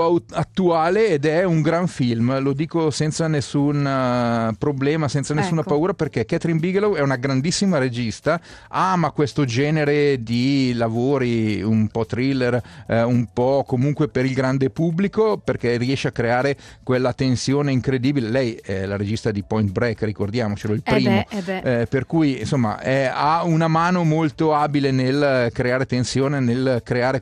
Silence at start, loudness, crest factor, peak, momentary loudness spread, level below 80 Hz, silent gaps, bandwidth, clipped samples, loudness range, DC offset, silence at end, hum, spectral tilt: 0 s; -20 LUFS; 14 dB; -4 dBFS; 5 LU; -50 dBFS; none; 11 kHz; under 0.1%; 2 LU; under 0.1%; 0 s; none; -6.5 dB/octave